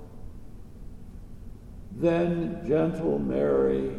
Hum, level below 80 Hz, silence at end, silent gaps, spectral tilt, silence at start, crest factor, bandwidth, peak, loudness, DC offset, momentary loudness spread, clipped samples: none; -46 dBFS; 0 s; none; -9 dB/octave; 0 s; 16 dB; 11 kHz; -12 dBFS; -26 LUFS; under 0.1%; 23 LU; under 0.1%